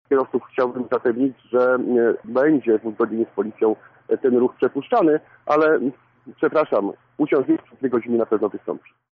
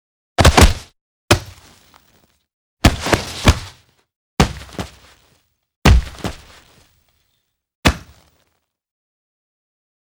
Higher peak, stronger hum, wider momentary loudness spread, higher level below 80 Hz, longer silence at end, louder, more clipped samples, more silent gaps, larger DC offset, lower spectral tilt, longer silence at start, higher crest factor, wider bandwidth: second, -8 dBFS vs 0 dBFS; neither; second, 7 LU vs 19 LU; second, -70 dBFS vs -24 dBFS; second, 0.4 s vs 2.2 s; second, -21 LUFS vs -16 LUFS; neither; second, none vs 1.01-1.28 s, 2.53-2.77 s, 4.16-4.37 s, 5.76-5.82 s, 7.75-7.83 s; neither; first, -6 dB/octave vs -4.5 dB/octave; second, 0.1 s vs 0.4 s; second, 12 dB vs 20 dB; second, 5.8 kHz vs over 20 kHz